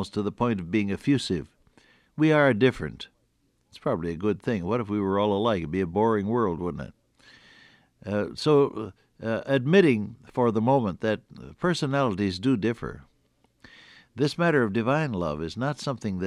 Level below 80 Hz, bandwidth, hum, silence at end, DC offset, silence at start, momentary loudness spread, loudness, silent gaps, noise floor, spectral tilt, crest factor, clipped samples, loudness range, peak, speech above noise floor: -54 dBFS; 11.5 kHz; none; 0 s; under 0.1%; 0 s; 14 LU; -26 LUFS; none; -69 dBFS; -7 dB/octave; 20 dB; under 0.1%; 4 LU; -6 dBFS; 44 dB